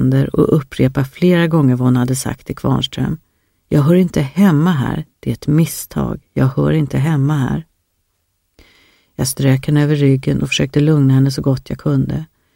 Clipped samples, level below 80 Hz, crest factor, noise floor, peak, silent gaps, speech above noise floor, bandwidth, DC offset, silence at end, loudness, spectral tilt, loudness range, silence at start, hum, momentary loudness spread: under 0.1%; -40 dBFS; 14 dB; -67 dBFS; 0 dBFS; none; 52 dB; 16.5 kHz; under 0.1%; 0.3 s; -15 LUFS; -6.5 dB/octave; 4 LU; 0 s; none; 9 LU